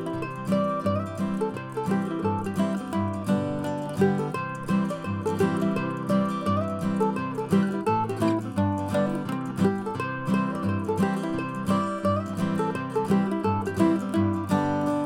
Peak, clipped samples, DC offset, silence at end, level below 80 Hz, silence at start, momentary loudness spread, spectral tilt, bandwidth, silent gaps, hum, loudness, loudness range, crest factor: -10 dBFS; under 0.1%; under 0.1%; 0 s; -58 dBFS; 0 s; 5 LU; -7.5 dB/octave; 15.5 kHz; none; none; -26 LUFS; 2 LU; 16 dB